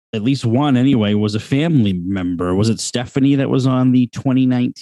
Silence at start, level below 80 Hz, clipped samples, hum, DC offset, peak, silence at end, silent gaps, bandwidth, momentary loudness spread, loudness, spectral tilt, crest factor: 0.15 s; -52 dBFS; under 0.1%; none; under 0.1%; -4 dBFS; 0 s; none; 11.5 kHz; 6 LU; -16 LUFS; -6.5 dB/octave; 12 dB